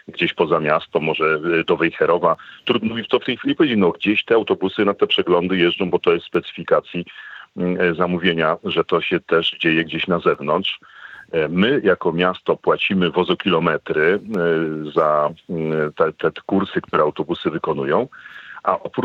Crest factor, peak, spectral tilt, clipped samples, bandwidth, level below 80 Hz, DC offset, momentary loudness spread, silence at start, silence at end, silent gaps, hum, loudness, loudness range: 18 dB; 0 dBFS; -7.5 dB/octave; under 0.1%; 6.4 kHz; -60 dBFS; under 0.1%; 7 LU; 0.1 s; 0 s; none; none; -19 LUFS; 2 LU